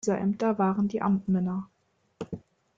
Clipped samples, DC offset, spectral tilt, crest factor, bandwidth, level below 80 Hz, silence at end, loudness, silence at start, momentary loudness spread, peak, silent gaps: under 0.1%; under 0.1%; -7.5 dB/octave; 14 dB; 7.8 kHz; -64 dBFS; 0.4 s; -27 LUFS; 0.05 s; 17 LU; -14 dBFS; none